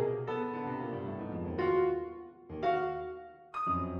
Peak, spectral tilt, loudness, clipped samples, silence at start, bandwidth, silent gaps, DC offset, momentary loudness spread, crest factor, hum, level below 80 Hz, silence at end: -18 dBFS; -9 dB/octave; -35 LUFS; under 0.1%; 0 s; 6.2 kHz; none; under 0.1%; 14 LU; 16 dB; none; -60 dBFS; 0 s